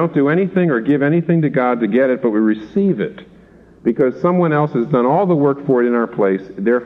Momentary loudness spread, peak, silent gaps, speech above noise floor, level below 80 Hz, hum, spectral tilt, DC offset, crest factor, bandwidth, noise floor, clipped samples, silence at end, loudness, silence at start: 4 LU; -2 dBFS; none; 29 dB; -56 dBFS; none; -10.5 dB/octave; under 0.1%; 14 dB; 5.6 kHz; -45 dBFS; under 0.1%; 0 s; -16 LUFS; 0 s